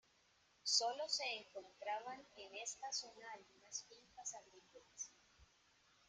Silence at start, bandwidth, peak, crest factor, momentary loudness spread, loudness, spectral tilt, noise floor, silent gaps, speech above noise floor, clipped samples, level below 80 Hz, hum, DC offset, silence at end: 0.65 s; 11.5 kHz; -22 dBFS; 26 dB; 21 LU; -44 LUFS; 1.5 dB/octave; -75 dBFS; none; 28 dB; under 0.1%; -84 dBFS; none; under 0.1%; 0.65 s